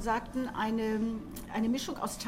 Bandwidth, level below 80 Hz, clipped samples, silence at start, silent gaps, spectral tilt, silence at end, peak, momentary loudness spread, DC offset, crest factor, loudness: 16 kHz; -52 dBFS; under 0.1%; 0 s; none; -4.5 dB/octave; 0 s; -20 dBFS; 5 LU; under 0.1%; 14 dB; -33 LUFS